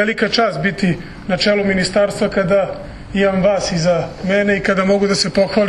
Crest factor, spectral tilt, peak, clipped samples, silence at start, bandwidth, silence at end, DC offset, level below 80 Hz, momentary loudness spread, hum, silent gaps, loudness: 14 dB; -5 dB/octave; -2 dBFS; under 0.1%; 0 s; 11.5 kHz; 0 s; under 0.1%; -40 dBFS; 5 LU; none; none; -16 LUFS